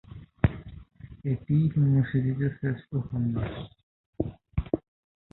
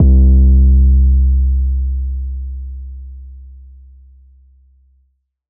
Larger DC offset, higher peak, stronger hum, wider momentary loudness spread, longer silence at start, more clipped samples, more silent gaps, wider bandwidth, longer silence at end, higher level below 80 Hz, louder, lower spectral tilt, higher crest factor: neither; second, -8 dBFS vs -2 dBFS; neither; about the same, 21 LU vs 22 LU; about the same, 0.1 s vs 0 s; neither; first, 3.83-4.13 s vs none; first, 4.1 kHz vs 0.7 kHz; second, 0.55 s vs 2.05 s; second, -44 dBFS vs -14 dBFS; second, -29 LUFS vs -13 LUFS; second, -12.5 dB/octave vs -19 dB/octave; first, 20 dB vs 12 dB